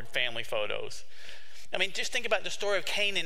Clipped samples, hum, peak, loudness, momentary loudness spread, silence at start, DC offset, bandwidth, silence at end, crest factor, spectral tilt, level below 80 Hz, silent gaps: under 0.1%; none; -10 dBFS; -31 LUFS; 19 LU; 0 s; 3%; 16 kHz; 0 s; 22 dB; -1.5 dB/octave; -64 dBFS; none